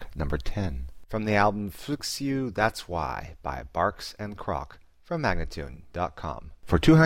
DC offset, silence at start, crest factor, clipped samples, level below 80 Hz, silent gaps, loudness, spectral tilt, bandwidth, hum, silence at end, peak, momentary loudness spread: 0.3%; 0 s; 20 dB; under 0.1%; -38 dBFS; none; -29 LUFS; -6 dB/octave; 16.5 kHz; none; 0 s; -6 dBFS; 13 LU